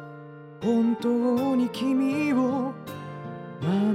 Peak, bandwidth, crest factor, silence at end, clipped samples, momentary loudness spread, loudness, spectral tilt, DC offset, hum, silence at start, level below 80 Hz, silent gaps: -12 dBFS; 15.5 kHz; 12 dB; 0 s; under 0.1%; 14 LU; -25 LUFS; -7.5 dB/octave; under 0.1%; none; 0 s; -70 dBFS; none